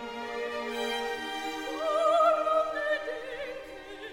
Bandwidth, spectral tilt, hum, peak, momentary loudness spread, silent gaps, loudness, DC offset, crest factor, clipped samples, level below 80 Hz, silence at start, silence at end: 17 kHz; -2.5 dB/octave; none; -12 dBFS; 15 LU; none; -30 LUFS; under 0.1%; 18 dB; under 0.1%; -62 dBFS; 0 s; 0 s